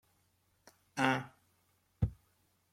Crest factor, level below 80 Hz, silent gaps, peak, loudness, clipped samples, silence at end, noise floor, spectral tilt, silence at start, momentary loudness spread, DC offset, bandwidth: 26 dB; -54 dBFS; none; -14 dBFS; -36 LUFS; under 0.1%; 0.6 s; -75 dBFS; -5.5 dB/octave; 0.95 s; 13 LU; under 0.1%; 16 kHz